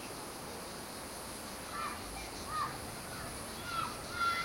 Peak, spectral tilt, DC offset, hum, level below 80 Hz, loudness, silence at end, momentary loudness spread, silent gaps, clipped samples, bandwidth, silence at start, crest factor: -22 dBFS; -2.5 dB/octave; under 0.1%; none; -58 dBFS; -40 LUFS; 0 s; 6 LU; none; under 0.1%; 16.5 kHz; 0 s; 18 dB